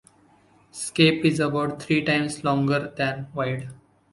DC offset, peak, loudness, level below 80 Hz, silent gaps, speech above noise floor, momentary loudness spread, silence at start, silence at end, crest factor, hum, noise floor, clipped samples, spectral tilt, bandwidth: under 0.1%; -4 dBFS; -23 LUFS; -60 dBFS; none; 34 dB; 13 LU; 0.75 s; 0.35 s; 22 dB; none; -58 dBFS; under 0.1%; -5 dB/octave; 11.5 kHz